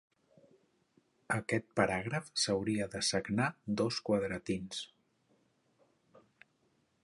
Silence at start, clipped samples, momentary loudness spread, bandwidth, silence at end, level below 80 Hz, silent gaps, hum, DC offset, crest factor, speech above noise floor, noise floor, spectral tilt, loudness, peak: 1.3 s; under 0.1%; 6 LU; 11.5 kHz; 2.15 s; -66 dBFS; none; none; under 0.1%; 24 dB; 41 dB; -75 dBFS; -4 dB/octave; -34 LUFS; -14 dBFS